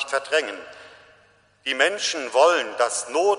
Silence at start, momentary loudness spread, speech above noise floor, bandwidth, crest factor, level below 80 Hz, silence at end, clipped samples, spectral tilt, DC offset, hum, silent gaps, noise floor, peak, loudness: 0 s; 15 LU; 36 dB; 10.5 kHz; 20 dB; -74 dBFS; 0 s; under 0.1%; 0 dB/octave; under 0.1%; none; none; -58 dBFS; -2 dBFS; -22 LUFS